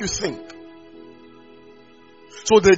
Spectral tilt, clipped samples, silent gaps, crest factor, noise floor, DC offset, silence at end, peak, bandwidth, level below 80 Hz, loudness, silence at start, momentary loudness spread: -3.5 dB/octave; under 0.1%; none; 20 dB; -49 dBFS; 0.2%; 0 s; -2 dBFS; 8 kHz; -48 dBFS; -21 LUFS; 0 s; 27 LU